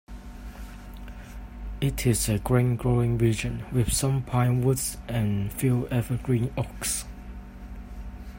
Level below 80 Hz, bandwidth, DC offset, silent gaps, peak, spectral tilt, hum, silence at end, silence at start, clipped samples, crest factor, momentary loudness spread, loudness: -40 dBFS; 16.5 kHz; under 0.1%; none; -8 dBFS; -5.5 dB/octave; none; 0 s; 0.1 s; under 0.1%; 18 dB; 19 LU; -26 LUFS